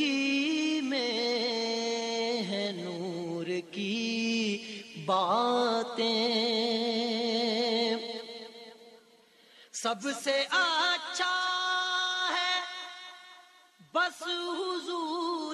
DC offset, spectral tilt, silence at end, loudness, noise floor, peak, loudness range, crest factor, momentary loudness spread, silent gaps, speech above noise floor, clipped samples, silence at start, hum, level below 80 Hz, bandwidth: under 0.1%; -3 dB/octave; 0 s; -30 LUFS; -61 dBFS; -16 dBFS; 4 LU; 16 dB; 12 LU; none; 31 dB; under 0.1%; 0 s; none; -86 dBFS; 13 kHz